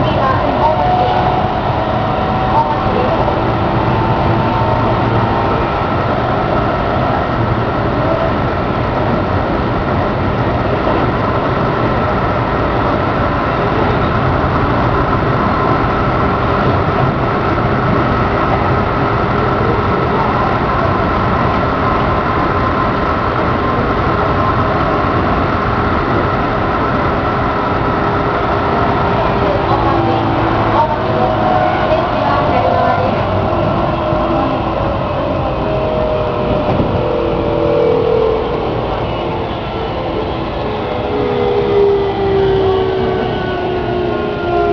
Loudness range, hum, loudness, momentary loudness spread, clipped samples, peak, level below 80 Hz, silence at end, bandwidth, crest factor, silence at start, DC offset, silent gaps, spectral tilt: 2 LU; none; -14 LUFS; 4 LU; under 0.1%; 0 dBFS; -26 dBFS; 0 s; 5.4 kHz; 14 dB; 0 s; under 0.1%; none; -8.5 dB/octave